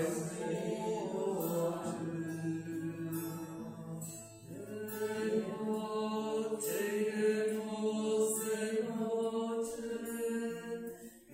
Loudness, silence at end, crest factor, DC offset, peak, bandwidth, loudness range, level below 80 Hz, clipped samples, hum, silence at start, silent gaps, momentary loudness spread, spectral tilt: -37 LUFS; 0 s; 16 dB; under 0.1%; -22 dBFS; 16 kHz; 6 LU; -74 dBFS; under 0.1%; none; 0 s; none; 11 LU; -5 dB/octave